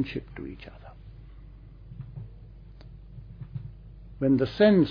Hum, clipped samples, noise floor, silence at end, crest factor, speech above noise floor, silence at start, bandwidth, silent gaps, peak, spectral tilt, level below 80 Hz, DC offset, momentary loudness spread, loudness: none; under 0.1%; -47 dBFS; 0 s; 20 dB; 22 dB; 0 s; 5.2 kHz; none; -10 dBFS; -9.5 dB/octave; -48 dBFS; under 0.1%; 28 LU; -25 LUFS